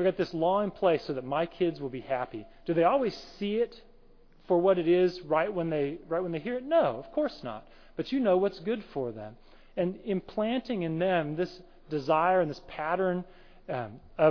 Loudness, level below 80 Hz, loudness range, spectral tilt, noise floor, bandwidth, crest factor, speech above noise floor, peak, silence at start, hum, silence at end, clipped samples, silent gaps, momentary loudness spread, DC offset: -29 LUFS; -56 dBFS; 4 LU; -8 dB/octave; -56 dBFS; 5.4 kHz; 18 dB; 27 dB; -12 dBFS; 0 s; none; 0 s; under 0.1%; none; 13 LU; under 0.1%